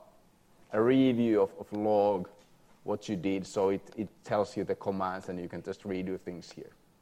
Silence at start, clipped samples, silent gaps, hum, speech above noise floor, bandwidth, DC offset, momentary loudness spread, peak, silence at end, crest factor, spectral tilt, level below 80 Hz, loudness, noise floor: 0.7 s; under 0.1%; none; none; 31 dB; 13 kHz; under 0.1%; 15 LU; -14 dBFS; 0.35 s; 16 dB; -7 dB/octave; -70 dBFS; -31 LUFS; -62 dBFS